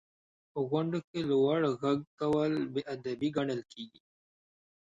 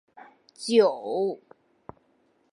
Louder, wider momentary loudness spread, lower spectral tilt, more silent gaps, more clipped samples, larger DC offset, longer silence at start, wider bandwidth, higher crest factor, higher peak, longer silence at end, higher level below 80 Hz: second, -32 LUFS vs -25 LUFS; second, 12 LU vs 16 LU; first, -7.5 dB/octave vs -4.5 dB/octave; first, 1.04-1.14 s, 2.07-2.18 s vs none; neither; neither; about the same, 0.55 s vs 0.6 s; second, 7.8 kHz vs 11.5 kHz; about the same, 16 dB vs 20 dB; second, -16 dBFS vs -8 dBFS; second, 0.95 s vs 1.15 s; about the same, -70 dBFS vs -74 dBFS